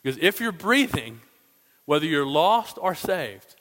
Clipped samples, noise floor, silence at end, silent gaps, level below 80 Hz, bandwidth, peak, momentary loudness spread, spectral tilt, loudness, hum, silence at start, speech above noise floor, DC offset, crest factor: under 0.1%; -61 dBFS; 0.25 s; none; -58 dBFS; 16.5 kHz; -4 dBFS; 9 LU; -4.5 dB/octave; -23 LUFS; none; 0.05 s; 37 dB; under 0.1%; 22 dB